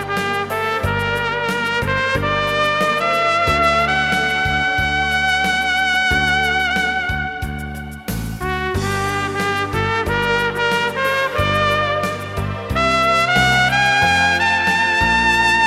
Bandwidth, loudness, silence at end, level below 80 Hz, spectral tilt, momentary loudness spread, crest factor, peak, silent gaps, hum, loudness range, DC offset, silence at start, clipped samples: 16 kHz; -17 LUFS; 0 s; -34 dBFS; -4 dB/octave; 9 LU; 16 dB; -2 dBFS; none; none; 5 LU; under 0.1%; 0 s; under 0.1%